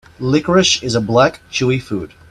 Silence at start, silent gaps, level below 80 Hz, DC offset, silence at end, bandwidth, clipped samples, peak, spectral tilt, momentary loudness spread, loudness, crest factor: 0.2 s; none; -46 dBFS; under 0.1%; 0.25 s; 12 kHz; under 0.1%; 0 dBFS; -4.5 dB/octave; 9 LU; -15 LUFS; 16 dB